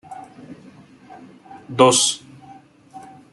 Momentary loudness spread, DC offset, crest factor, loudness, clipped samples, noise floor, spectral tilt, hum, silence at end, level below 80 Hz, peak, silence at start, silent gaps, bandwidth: 28 LU; under 0.1%; 22 dB; -17 LUFS; under 0.1%; -46 dBFS; -2.5 dB/octave; none; 0.35 s; -66 dBFS; -2 dBFS; 0.1 s; none; 12 kHz